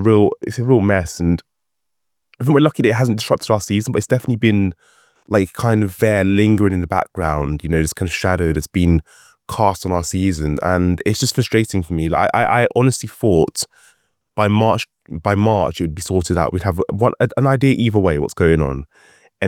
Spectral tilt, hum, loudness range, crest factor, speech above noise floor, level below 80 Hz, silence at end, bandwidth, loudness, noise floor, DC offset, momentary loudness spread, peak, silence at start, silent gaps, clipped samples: -6 dB/octave; none; 2 LU; 16 dB; 64 dB; -38 dBFS; 0 s; 17 kHz; -17 LUFS; -80 dBFS; under 0.1%; 6 LU; 0 dBFS; 0 s; none; under 0.1%